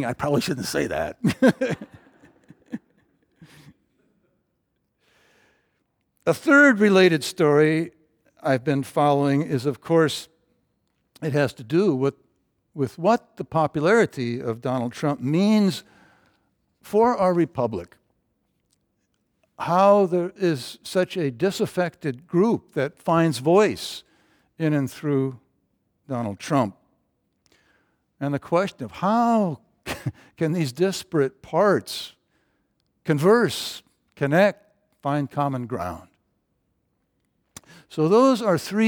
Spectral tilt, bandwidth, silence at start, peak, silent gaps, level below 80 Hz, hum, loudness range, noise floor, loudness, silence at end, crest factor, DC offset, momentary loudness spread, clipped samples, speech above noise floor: -6 dB/octave; over 20 kHz; 0 s; -4 dBFS; none; -62 dBFS; none; 8 LU; -74 dBFS; -22 LUFS; 0 s; 20 dB; under 0.1%; 15 LU; under 0.1%; 52 dB